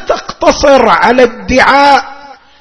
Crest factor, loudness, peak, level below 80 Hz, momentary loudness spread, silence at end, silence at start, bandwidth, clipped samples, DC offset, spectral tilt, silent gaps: 8 dB; -7 LUFS; 0 dBFS; -32 dBFS; 6 LU; 0.3 s; 0 s; 11 kHz; 3%; under 0.1%; -3.5 dB/octave; none